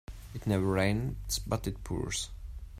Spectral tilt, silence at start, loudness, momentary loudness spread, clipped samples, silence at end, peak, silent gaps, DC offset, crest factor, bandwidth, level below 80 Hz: -5 dB/octave; 0.1 s; -33 LUFS; 12 LU; under 0.1%; 0 s; -14 dBFS; none; under 0.1%; 18 dB; 16 kHz; -44 dBFS